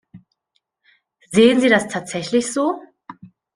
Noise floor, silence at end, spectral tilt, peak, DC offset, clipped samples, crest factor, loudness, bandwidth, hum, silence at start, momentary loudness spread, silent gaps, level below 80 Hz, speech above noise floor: -71 dBFS; 0.45 s; -4 dB/octave; -2 dBFS; under 0.1%; under 0.1%; 20 dB; -17 LUFS; 10.5 kHz; none; 0.15 s; 12 LU; none; -60 dBFS; 55 dB